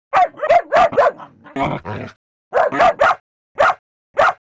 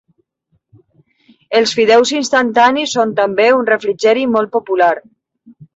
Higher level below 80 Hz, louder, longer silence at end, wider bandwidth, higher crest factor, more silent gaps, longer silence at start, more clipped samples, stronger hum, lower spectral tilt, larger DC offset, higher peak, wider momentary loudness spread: first, -48 dBFS vs -60 dBFS; second, -16 LUFS vs -13 LUFS; first, 0.25 s vs 0.1 s; about the same, 8 kHz vs 8 kHz; about the same, 14 dB vs 14 dB; first, 2.16-2.51 s, 3.20-3.55 s, 3.79-4.14 s vs none; second, 0.15 s vs 1.5 s; neither; neither; first, -5 dB/octave vs -3 dB/octave; neither; second, -4 dBFS vs 0 dBFS; first, 16 LU vs 5 LU